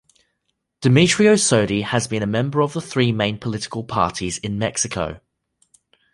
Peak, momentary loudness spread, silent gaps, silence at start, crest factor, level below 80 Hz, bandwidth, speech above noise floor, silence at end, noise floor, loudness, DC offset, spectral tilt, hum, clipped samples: -2 dBFS; 12 LU; none; 0.8 s; 18 dB; -48 dBFS; 11.5 kHz; 55 dB; 0.95 s; -74 dBFS; -19 LUFS; under 0.1%; -4.5 dB/octave; none; under 0.1%